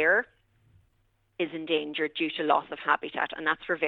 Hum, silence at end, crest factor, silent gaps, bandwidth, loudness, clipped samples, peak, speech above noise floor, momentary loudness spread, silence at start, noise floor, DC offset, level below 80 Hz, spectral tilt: none; 0 s; 22 dB; none; 6.8 kHz; -28 LUFS; under 0.1%; -8 dBFS; 42 dB; 8 LU; 0 s; -70 dBFS; under 0.1%; -70 dBFS; -6 dB/octave